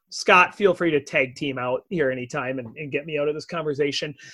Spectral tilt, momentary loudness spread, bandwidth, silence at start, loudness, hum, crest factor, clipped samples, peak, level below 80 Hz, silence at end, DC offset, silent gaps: -4.5 dB/octave; 13 LU; 12 kHz; 0.1 s; -23 LUFS; none; 22 dB; under 0.1%; -2 dBFS; -62 dBFS; 0 s; under 0.1%; none